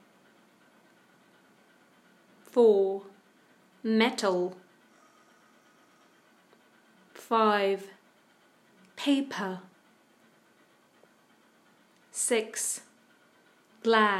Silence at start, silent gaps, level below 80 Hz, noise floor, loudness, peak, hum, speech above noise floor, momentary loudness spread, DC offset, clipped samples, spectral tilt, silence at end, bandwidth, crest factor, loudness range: 2.55 s; none; under -90 dBFS; -63 dBFS; -28 LUFS; -8 dBFS; none; 37 dB; 16 LU; under 0.1%; under 0.1%; -3 dB/octave; 0 s; 14 kHz; 24 dB; 8 LU